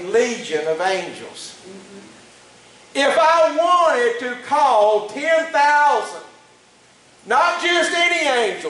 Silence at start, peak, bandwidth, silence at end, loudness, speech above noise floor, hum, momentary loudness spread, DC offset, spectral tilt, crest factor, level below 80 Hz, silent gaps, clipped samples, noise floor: 0 s; -4 dBFS; 11.5 kHz; 0 s; -17 LUFS; 33 dB; none; 16 LU; under 0.1%; -2 dB/octave; 14 dB; -66 dBFS; none; under 0.1%; -51 dBFS